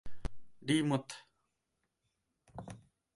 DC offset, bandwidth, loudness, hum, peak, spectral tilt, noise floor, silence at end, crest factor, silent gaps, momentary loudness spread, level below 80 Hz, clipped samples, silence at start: under 0.1%; 11.5 kHz; -34 LUFS; none; -18 dBFS; -5.5 dB/octave; -84 dBFS; 0.35 s; 22 dB; none; 21 LU; -54 dBFS; under 0.1%; 0.05 s